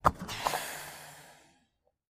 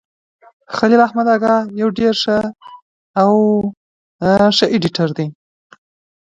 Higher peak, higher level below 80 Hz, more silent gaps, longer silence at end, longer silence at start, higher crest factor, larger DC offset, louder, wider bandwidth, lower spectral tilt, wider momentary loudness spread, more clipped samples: second, -6 dBFS vs 0 dBFS; about the same, -52 dBFS vs -52 dBFS; second, none vs 2.82-3.14 s, 3.77-4.19 s; second, 0.75 s vs 0.9 s; second, 0.05 s vs 0.7 s; first, 30 dB vs 16 dB; neither; second, -35 LUFS vs -15 LUFS; first, 15.5 kHz vs 7.8 kHz; second, -3.5 dB/octave vs -6 dB/octave; first, 20 LU vs 12 LU; neither